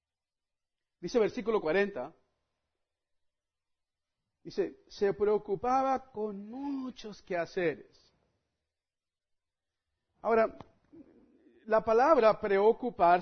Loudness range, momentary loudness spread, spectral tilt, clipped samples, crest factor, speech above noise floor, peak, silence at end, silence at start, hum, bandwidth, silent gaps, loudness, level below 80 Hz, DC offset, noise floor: 11 LU; 15 LU; -6 dB/octave; under 0.1%; 22 dB; over 61 dB; -10 dBFS; 0 s; 1 s; none; 6.6 kHz; none; -30 LUFS; -62 dBFS; under 0.1%; under -90 dBFS